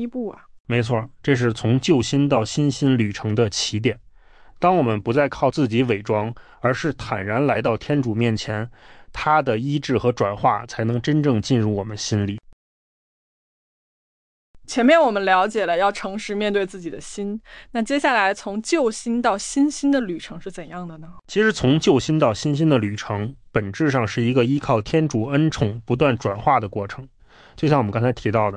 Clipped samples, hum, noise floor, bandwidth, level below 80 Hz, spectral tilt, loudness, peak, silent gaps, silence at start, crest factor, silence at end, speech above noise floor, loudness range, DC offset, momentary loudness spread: under 0.1%; none; -47 dBFS; 10.5 kHz; -50 dBFS; -6 dB/octave; -21 LUFS; -4 dBFS; 0.60-0.65 s, 12.53-14.54 s; 0 s; 16 dB; 0 s; 27 dB; 3 LU; under 0.1%; 11 LU